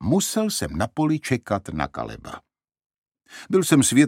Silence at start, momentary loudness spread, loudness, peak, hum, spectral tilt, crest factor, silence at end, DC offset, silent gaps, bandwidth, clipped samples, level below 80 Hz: 0 s; 20 LU; -23 LUFS; -2 dBFS; none; -4.5 dB/octave; 20 dB; 0 s; under 0.1%; 2.86-2.90 s, 2.98-3.02 s; 16.5 kHz; under 0.1%; -48 dBFS